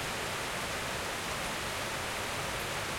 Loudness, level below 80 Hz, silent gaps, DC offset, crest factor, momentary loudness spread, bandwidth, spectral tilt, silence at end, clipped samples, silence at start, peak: -34 LUFS; -52 dBFS; none; under 0.1%; 14 dB; 0 LU; 16.5 kHz; -2.5 dB/octave; 0 s; under 0.1%; 0 s; -22 dBFS